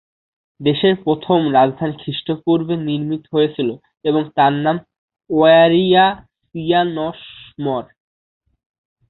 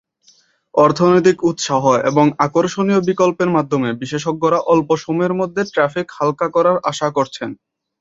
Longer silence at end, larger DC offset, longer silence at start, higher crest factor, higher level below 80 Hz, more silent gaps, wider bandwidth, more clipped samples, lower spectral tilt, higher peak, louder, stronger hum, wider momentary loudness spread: first, 1.25 s vs 0.45 s; neither; second, 0.6 s vs 0.75 s; about the same, 16 dB vs 16 dB; about the same, -56 dBFS vs -58 dBFS; first, 4.98-5.08 s vs none; second, 4.3 kHz vs 7.8 kHz; neither; first, -11 dB/octave vs -6 dB/octave; about the same, -2 dBFS vs -2 dBFS; about the same, -17 LUFS vs -16 LUFS; neither; first, 14 LU vs 8 LU